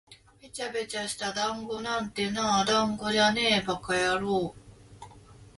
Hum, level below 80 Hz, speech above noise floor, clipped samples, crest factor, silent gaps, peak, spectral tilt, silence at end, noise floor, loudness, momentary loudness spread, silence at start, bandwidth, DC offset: none; -58 dBFS; 23 dB; under 0.1%; 18 dB; none; -10 dBFS; -3 dB/octave; 0.1 s; -51 dBFS; -27 LUFS; 10 LU; 0.1 s; 11.5 kHz; under 0.1%